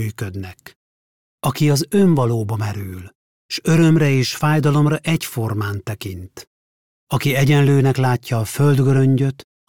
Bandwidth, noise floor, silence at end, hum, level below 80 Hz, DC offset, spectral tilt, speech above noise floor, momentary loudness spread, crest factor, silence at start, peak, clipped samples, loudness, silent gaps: 17.5 kHz; under -90 dBFS; 0.25 s; none; -50 dBFS; under 0.1%; -6.5 dB/octave; over 73 dB; 15 LU; 12 dB; 0 s; -6 dBFS; under 0.1%; -17 LUFS; 0.76-1.38 s, 3.15-3.49 s, 6.47-7.07 s